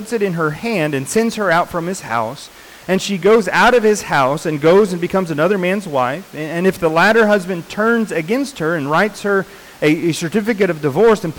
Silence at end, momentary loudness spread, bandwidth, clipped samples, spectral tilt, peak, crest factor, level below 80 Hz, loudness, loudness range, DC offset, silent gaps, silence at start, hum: 0 s; 9 LU; 19 kHz; under 0.1%; -5 dB/octave; -4 dBFS; 10 dB; -48 dBFS; -16 LUFS; 3 LU; under 0.1%; none; 0 s; none